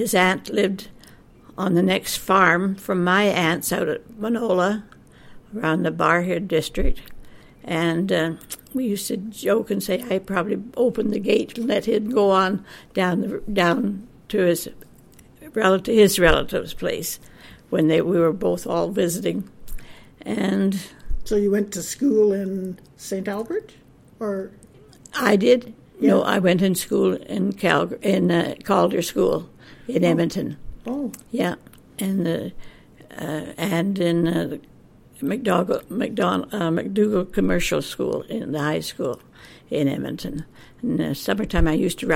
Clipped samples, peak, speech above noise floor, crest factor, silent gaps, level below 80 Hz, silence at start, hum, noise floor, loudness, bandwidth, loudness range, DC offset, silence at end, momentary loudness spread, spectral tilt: under 0.1%; -2 dBFS; 28 dB; 20 dB; none; -38 dBFS; 0 s; none; -49 dBFS; -22 LUFS; 16.5 kHz; 5 LU; under 0.1%; 0 s; 13 LU; -5 dB/octave